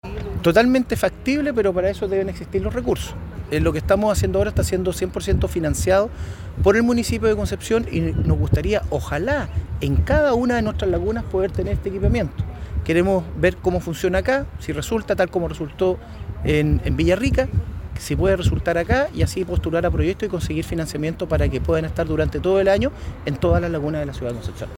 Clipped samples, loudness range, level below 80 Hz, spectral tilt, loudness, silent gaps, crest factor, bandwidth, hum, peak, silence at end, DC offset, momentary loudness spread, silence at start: under 0.1%; 2 LU; -30 dBFS; -6.5 dB/octave; -21 LUFS; none; 18 dB; 17 kHz; none; -4 dBFS; 0 s; under 0.1%; 9 LU; 0.05 s